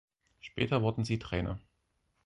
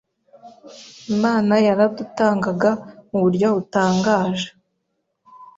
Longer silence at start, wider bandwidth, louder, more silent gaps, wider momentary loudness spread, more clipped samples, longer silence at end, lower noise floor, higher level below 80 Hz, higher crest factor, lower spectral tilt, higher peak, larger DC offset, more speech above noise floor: about the same, 0.45 s vs 0.45 s; first, 11 kHz vs 7.8 kHz; second, -33 LUFS vs -19 LUFS; neither; first, 15 LU vs 11 LU; neither; first, 0.7 s vs 0.1 s; first, -77 dBFS vs -73 dBFS; first, -52 dBFS vs -60 dBFS; about the same, 22 dB vs 18 dB; about the same, -7 dB/octave vs -6 dB/octave; second, -14 dBFS vs -4 dBFS; neither; second, 45 dB vs 55 dB